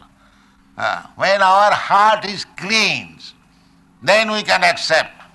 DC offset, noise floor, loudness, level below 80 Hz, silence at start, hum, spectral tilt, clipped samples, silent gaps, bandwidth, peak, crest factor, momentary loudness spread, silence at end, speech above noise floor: under 0.1%; -52 dBFS; -15 LUFS; -58 dBFS; 0.75 s; none; -2.5 dB/octave; under 0.1%; none; 12 kHz; -2 dBFS; 14 dB; 11 LU; 0.1 s; 36 dB